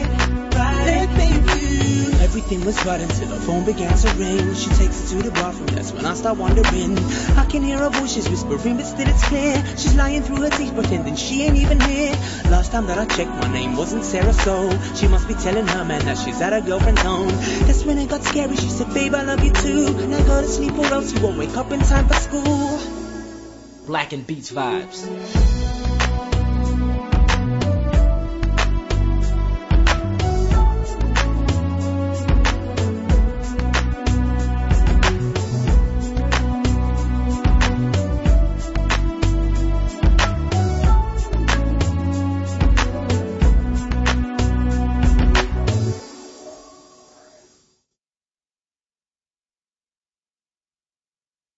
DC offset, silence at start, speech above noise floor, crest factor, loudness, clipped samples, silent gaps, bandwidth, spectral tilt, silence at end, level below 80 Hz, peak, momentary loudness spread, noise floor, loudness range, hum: under 0.1%; 0 s; over 72 dB; 14 dB; -20 LUFS; under 0.1%; none; 8 kHz; -5.5 dB/octave; 5 s; -20 dBFS; -4 dBFS; 6 LU; under -90 dBFS; 3 LU; none